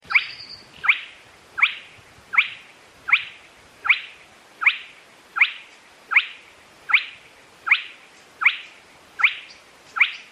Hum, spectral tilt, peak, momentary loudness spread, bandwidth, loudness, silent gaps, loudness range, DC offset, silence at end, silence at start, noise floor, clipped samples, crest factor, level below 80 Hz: none; 0 dB/octave; -4 dBFS; 18 LU; 13 kHz; -20 LUFS; none; 1 LU; under 0.1%; 0.1 s; 0.1 s; -49 dBFS; under 0.1%; 20 dB; -68 dBFS